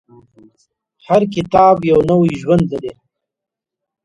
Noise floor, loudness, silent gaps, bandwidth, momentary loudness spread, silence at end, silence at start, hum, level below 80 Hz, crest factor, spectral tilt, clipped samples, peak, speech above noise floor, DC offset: -84 dBFS; -14 LUFS; none; 11 kHz; 10 LU; 1.15 s; 1.1 s; none; -44 dBFS; 16 dB; -8 dB/octave; under 0.1%; 0 dBFS; 70 dB; under 0.1%